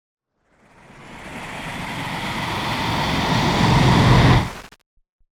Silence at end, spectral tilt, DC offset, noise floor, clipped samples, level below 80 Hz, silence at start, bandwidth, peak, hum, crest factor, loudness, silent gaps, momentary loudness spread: 0.7 s; -5.5 dB/octave; under 0.1%; -59 dBFS; under 0.1%; -34 dBFS; 1 s; 17 kHz; -2 dBFS; none; 18 dB; -19 LUFS; none; 19 LU